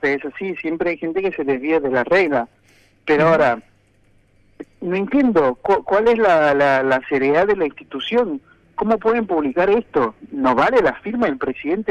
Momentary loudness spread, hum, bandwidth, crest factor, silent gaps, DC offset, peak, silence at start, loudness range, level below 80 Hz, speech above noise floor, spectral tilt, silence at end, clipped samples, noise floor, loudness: 10 LU; none; 8.8 kHz; 16 dB; none; under 0.1%; -4 dBFS; 0 s; 3 LU; -52 dBFS; 38 dB; -7 dB/octave; 0 s; under 0.1%; -56 dBFS; -18 LUFS